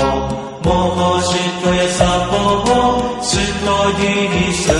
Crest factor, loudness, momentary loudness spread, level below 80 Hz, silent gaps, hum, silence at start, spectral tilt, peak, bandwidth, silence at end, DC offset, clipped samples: 14 dB; -15 LUFS; 4 LU; -30 dBFS; none; none; 0 s; -4.5 dB/octave; -2 dBFS; 11.5 kHz; 0 s; under 0.1%; under 0.1%